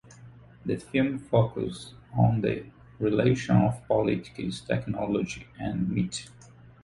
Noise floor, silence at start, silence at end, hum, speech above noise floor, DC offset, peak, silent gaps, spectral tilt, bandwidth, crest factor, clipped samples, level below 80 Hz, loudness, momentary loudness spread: -50 dBFS; 0.1 s; 0.15 s; none; 23 dB; under 0.1%; -8 dBFS; none; -7 dB/octave; 11.5 kHz; 20 dB; under 0.1%; -52 dBFS; -28 LUFS; 11 LU